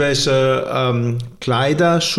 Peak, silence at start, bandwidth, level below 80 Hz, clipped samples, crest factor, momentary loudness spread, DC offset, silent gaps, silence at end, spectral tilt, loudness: -4 dBFS; 0 s; 14.5 kHz; -48 dBFS; under 0.1%; 12 dB; 6 LU; under 0.1%; none; 0 s; -5 dB/octave; -17 LUFS